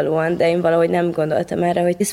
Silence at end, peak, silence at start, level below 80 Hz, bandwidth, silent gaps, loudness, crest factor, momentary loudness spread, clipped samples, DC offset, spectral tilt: 0 s; -6 dBFS; 0 s; -54 dBFS; 15 kHz; none; -18 LUFS; 12 dB; 4 LU; under 0.1%; under 0.1%; -6 dB/octave